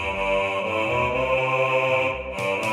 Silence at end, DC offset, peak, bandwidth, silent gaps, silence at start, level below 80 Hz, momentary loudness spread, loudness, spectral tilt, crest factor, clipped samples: 0 s; under 0.1%; -10 dBFS; 14 kHz; none; 0 s; -44 dBFS; 5 LU; -22 LUFS; -5 dB/octave; 14 dB; under 0.1%